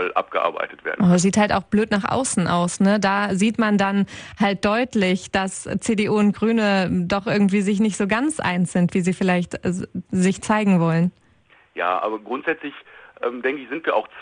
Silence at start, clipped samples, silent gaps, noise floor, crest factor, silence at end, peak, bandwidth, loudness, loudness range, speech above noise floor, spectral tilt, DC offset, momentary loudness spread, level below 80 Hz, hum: 0 s; under 0.1%; none; -56 dBFS; 18 dB; 0 s; -4 dBFS; 10.5 kHz; -21 LUFS; 3 LU; 35 dB; -5.5 dB/octave; under 0.1%; 8 LU; -52 dBFS; none